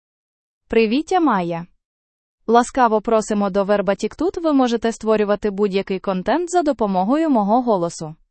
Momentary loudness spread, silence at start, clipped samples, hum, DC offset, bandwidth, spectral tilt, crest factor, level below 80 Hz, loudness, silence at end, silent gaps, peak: 5 LU; 0.7 s; under 0.1%; none; under 0.1%; 8.8 kHz; -6 dB/octave; 18 dB; -50 dBFS; -19 LUFS; 0.15 s; 1.85-2.38 s; -2 dBFS